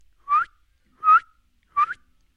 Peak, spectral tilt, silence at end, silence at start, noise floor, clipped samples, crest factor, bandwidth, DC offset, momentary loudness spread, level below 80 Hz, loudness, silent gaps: -8 dBFS; -1.5 dB/octave; 0.45 s; 0.3 s; -61 dBFS; under 0.1%; 16 dB; 6.4 kHz; under 0.1%; 13 LU; -64 dBFS; -21 LUFS; none